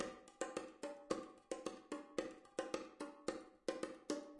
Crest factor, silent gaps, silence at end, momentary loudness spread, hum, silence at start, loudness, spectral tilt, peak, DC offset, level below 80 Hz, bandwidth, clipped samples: 22 dB; none; 0 s; 5 LU; none; 0 s; -48 LUFS; -3.5 dB/octave; -26 dBFS; under 0.1%; -78 dBFS; 11.5 kHz; under 0.1%